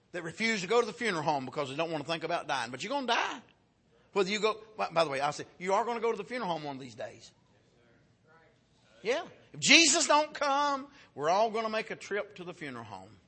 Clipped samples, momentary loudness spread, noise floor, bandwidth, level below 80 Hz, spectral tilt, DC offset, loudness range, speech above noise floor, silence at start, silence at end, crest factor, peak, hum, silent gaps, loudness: under 0.1%; 16 LU; -67 dBFS; 8.8 kHz; -76 dBFS; -2 dB/octave; under 0.1%; 10 LU; 36 dB; 0.15 s; 0.2 s; 26 dB; -6 dBFS; none; none; -29 LUFS